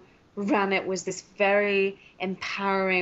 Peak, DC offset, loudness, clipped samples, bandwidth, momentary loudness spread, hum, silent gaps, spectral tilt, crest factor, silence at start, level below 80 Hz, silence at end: -10 dBFS; under 0.1%; -26 LUFS; under 0.1%; 8 kHz; 12 LU; none; none; -3 dB/octave; 16 dB; 0.35 s; -68 dBFS; 0 s